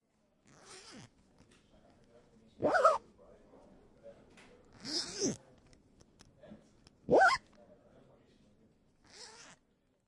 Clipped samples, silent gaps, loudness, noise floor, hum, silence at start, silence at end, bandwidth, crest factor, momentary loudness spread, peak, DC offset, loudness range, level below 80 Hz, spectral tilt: under 0.1%; none; -31 LUFS; -74 dBFS; none; 0.7 s; 0.8 s; 11.5 kHz; 26 dB; 28 LU; -12 dBFS; under 0.1%; 8 LU; -70 dBFS; -3 dB/octave